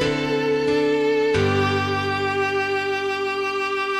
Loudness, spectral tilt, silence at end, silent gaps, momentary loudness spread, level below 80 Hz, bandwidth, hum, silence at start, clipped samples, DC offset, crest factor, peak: -21 LUFS; -5.5 dB/octave; 0 s; none; 4 LU; -50 dBFS; 14.5 kHz; none; 0 s; under 0.1%; under 0.1%; 12 dB; -10 dBFS